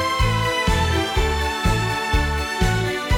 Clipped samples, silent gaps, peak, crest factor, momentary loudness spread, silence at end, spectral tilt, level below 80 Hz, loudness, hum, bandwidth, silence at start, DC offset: under 0.1%; none; -6 dBFS; 14 dB; 2 LU; 0 s; -4.5 dB/octave; -26 dBFS; -21 LUFS; none; 17 kHz; 0 s; under 0.1%